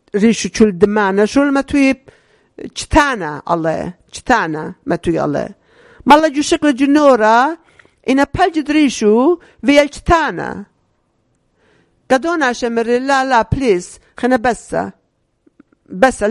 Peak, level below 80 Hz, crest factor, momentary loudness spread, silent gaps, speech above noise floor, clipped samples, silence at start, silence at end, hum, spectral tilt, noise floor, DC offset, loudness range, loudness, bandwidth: 0 dBFS; -36 dBFS; 14 dB; 14 LU; none; 48 dB; 0.3%; 0.15 s; 0 s; none; -5 dB/octave; -62 dBFS; under 0.1%; 5 LU; -14 LUFS; 11.5 kHz